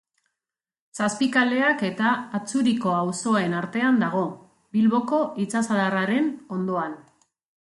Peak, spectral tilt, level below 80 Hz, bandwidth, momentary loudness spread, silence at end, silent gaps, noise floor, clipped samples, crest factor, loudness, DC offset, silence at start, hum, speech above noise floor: -6 dBFS; -5 dB/octave; -70 dBFS; 11.5 kHz; 8 LU; 0.6 s; none; -90 dBFS; under 0.1%; 18 dB; -23 LUFS; under 0.1%; 0.95 s; none; 67 dB